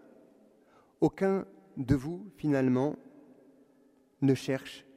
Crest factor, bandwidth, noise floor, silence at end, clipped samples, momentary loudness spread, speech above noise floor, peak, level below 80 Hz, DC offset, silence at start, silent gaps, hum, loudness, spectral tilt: 20 dB; 14.5 kHz; -65 dBFS; 0.15 s; under 0.1%; 13 LU; 35 dB; -12 dBFS; -56 dBFS; under 0.1%; 1 s; none; none; -31 LUFS; -7.5 dB/octave